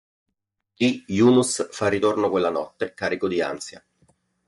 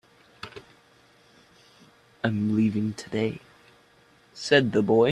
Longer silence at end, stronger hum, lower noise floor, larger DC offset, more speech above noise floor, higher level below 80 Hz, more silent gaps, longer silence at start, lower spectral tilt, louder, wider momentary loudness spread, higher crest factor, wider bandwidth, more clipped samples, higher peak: first, 0.7 s vs 0 s; neither; first, -78 dBFS vs -59 dBFS; neither; first, 56 dB vs 36 dB; about the same, -66 dBFS vs -64 dBFS; neither; first, 0.8 s vs 0.45 s; second, -4.5 dB/octave vs -6 dB/octave; first, -22 LUFS vs -25 LUFS; second, 11 LU vs 21 LU; second, 16 dB vs 22 dB; about the same, 11.5 kHz vs 11 kHz; neither; about the same, -8 dBFS vs -6 dBFS